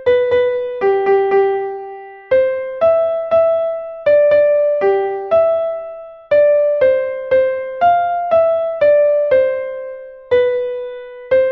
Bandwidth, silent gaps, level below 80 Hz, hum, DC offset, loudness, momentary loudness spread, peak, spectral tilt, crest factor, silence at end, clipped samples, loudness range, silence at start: 5.2 kHz; none; -54 dBFS; none; under 0.1%; -15 LUFS; 14 LU; -4 dBFS; -7 dB/octave; 12 dB; 0 s; under 0.1%; 2 LU; 0 s